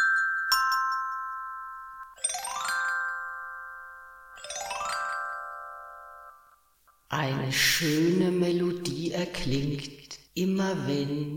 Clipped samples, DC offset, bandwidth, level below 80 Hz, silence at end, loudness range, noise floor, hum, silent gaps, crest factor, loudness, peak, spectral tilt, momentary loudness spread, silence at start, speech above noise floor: under 0.1%; under 0.1%; 17 kHz; -54 dBFS; 0 s; 9 LU; -64 dBFS; none; none; 20 dB; -28 LUFS; -10 dBFS; -4 dB/octave; 20 LU; 0 s; 37 dB